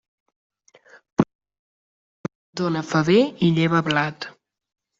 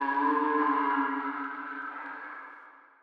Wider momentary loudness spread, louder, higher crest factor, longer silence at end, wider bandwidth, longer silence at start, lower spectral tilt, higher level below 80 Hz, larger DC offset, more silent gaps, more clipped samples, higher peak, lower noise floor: about the same, 18 LU vs 17 LU; first, -21 LUFS vs -30 LUFS; first, 20 dB vs 14 dB; first, 0.7 s vs 0.2 s; first, 7.8 kHz vs 5.2 kHz; first, 1.2 s vs 0 s; about the same, -6.5 dB/octave vs -5.5 dB/octave; first, -58 dBFS vs under -90 dBFS; neither; first, 1.35-1.39 s, 1.59-2.24 s, 2.35-2.53 s vs none; neither; first, -4 dBFS vs -16 dBFS; about the same, -53 dBFS vs -52 dBFS